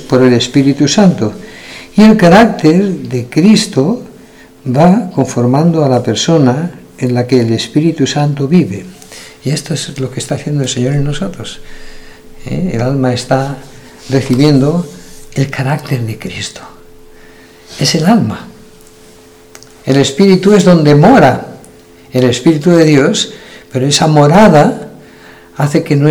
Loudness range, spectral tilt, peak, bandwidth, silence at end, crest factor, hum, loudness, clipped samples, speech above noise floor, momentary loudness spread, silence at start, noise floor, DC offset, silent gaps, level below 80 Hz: 8 LU; -6 dB/octave; 0 dBFS; 15.5 kHz; 0 s; 10 dB; none; -10 LUFS; 2%; 29 dB; 17 LU; 0 s; -39 dBFS; under 0.1%; none; -38 dBFS